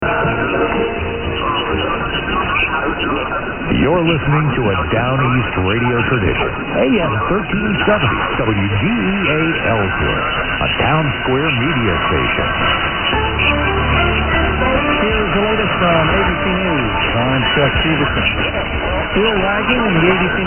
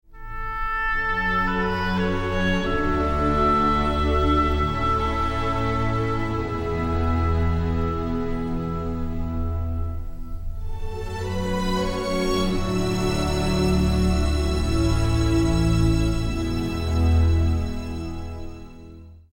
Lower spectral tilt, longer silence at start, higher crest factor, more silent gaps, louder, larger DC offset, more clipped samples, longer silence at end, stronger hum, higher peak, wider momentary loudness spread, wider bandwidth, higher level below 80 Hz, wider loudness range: first, -10 dB/octave vs -6.5 dB/octave; about the same, 0 s vs 0.1 s; about the same, 16 dB vs 14 dB; neither; first, -15 LUFS vs -23 LUFS; neither; neither; second, 0 s vs 0.15 s; neither; first, 0 dBFS vs -8 dBFS; second, 4 LU vs 12 LU; second, 3.4 kHz vs 16.5 kHz; about the same, -28 dBFS vs -28 dBFS; second, 2 LU vs 6 LU